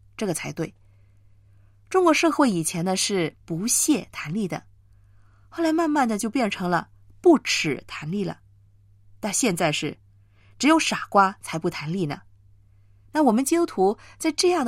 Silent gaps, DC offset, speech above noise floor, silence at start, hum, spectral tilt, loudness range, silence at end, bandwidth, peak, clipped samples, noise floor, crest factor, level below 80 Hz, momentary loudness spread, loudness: none; under 0.1%; 32 dB; 0.2 s; none; -4 dB/octave; 3 LU; 0 s; 16 kHz; -6 dBFS; under 0.1%; -55 dBFS; 20 dB; -60 dBFS; 12 LU; -23 LUFS